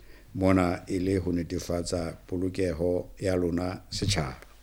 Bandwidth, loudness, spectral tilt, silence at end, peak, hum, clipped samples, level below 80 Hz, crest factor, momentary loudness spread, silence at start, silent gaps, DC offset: 16.5 kHz; -29 LUFS; -6 dB/octave; 0.15 s; -8 dBFS; none; under 0.1%; -48 dBFS; 20 dB; 8 LU; 0 s; none; under 0.1%